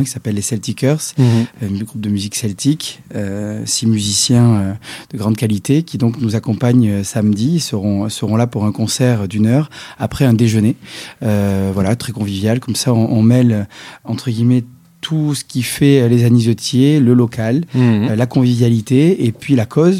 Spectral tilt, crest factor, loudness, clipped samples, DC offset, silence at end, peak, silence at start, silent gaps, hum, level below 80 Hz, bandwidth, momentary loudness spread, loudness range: -6 dB/octave; 14 dB; -15 LUFS; under 0.1%; under 0.1%; 0 s; 0 dBFS; 0 s; none; none; -50 dBFS; 15.5 kHz; 11 LU; 3 LU